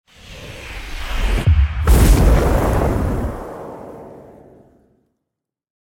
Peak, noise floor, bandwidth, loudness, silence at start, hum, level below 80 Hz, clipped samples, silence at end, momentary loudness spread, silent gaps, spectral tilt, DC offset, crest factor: -2 dBFS; -81 dBFS; 17 kHz; -17 LUFS; 0.3 s; none; -20 dBFS; under 0.1%; 1.75 s; 23 LU; none; -6 dB/octave; under 0.1%; 16 dB